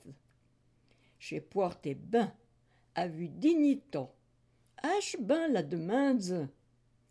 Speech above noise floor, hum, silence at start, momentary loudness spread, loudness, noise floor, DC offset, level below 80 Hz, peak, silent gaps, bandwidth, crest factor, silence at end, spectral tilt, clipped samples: 38 dB; none; 0.05 s; 13 LU; -33 LUFS; -70 dBFS; under 0.1%; -74 dBFS; -18 dBFS; none; 11 kHz; 16 dB; 0.6 s; -6 dB/octave; under 0.1%